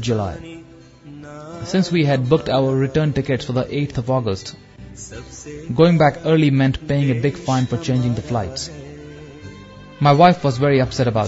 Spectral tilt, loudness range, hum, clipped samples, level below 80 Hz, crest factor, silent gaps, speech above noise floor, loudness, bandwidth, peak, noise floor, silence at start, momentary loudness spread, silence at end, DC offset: -6.5 dB/octave; 4 LU; none; under 0.1%; -44 dBFS; 18 dB; none; 24 dB; -18 LUFS; 8 kHz; 0 dBFS; -42 dBFS; 0 s; 23 LU; 0 s; under 0.1%